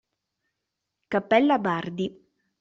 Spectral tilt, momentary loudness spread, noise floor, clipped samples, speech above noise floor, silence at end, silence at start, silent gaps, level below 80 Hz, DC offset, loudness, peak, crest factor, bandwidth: -7 dB/octave; 12 LU; -83 dBFS; under 0.1%; 59 dB; 0.5 s; 1.1 s; none; -68 dBFS; under 0.1%; -25 LUFS; -6 dBFS; 20 dB; 7.6 kHz